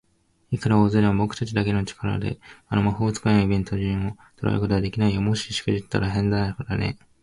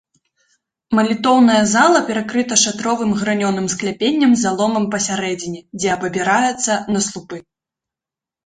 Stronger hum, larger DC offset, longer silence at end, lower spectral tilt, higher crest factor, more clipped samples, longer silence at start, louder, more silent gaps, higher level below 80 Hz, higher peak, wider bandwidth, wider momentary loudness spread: neither; neither; second, 0.3 s vs 1.05 s; first, -6.5 dB/octave vs -3.5 dB/octave; about the same, 16 dB vs 16 dB; neither; second, 0.5 s vs 0.9 s; second, -24 LUFS vs -16 LUFS; neither; first, -42 dBFS vs -56 dBFS; second, -6 dBFS vs 0 dBFS; first, 11.5 kHz vs 9.6 kHz; about the same, 8 LU vs 10 LU